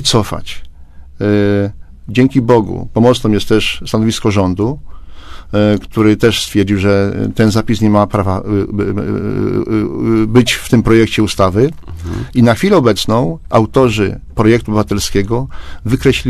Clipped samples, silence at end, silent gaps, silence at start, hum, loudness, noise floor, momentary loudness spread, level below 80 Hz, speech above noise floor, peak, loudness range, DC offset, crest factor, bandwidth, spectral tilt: 0.2%; 0 s; none; 0 s; none; -13 LUFS; -32 dBFS; 8 LU; -30 dBFS; 20 dB; 0 dBFS; 2 LU; under 0.1%; 12 dB; 14 kHz; -6 dB/octave